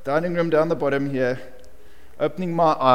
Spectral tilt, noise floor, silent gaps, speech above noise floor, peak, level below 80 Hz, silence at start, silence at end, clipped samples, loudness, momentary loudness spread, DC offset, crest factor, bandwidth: -7 dB/octave; -50 dBFS; none; 30 dB; -2 dBFS; -54 dBFS; 0.05 s; 0 s; under 0.1%; -22 LUFS; 7 LU; 2%; 20 dB; 16 kHz